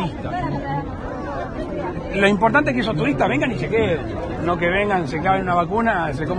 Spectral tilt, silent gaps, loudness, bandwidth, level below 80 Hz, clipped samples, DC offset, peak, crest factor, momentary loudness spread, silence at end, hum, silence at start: -7 dB/octave; none; -21 LUFS; 10 kHz; -38 dBFS; under 0.1%; under 0.1%; -2 dBFS; 18 dB; 11 LU; 0 s; none; 0 s